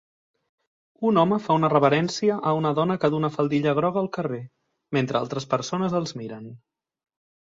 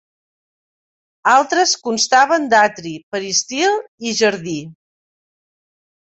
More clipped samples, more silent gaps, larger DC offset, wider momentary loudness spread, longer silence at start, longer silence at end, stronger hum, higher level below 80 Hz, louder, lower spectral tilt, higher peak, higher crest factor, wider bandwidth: neither; second, none vs 3.03-3.11 s, 3.88-3.98 s; neither; about the same, 12 LU vs 13 LU; second, 1 s vs 1.25 s; second, 0.9 s vs 1.3 s; neither; about the same, -64 dBFS vs -64 dBFS; second, -23 LUFS vs -16 LUFS; first, -6.5 dB/octave vs -2 dB/octave; about the same, -4 dBFS vs -2 dBFS; about the same, 20 dB vs 18 dB; about the same, 7.8 kHz vs 8.2 kHz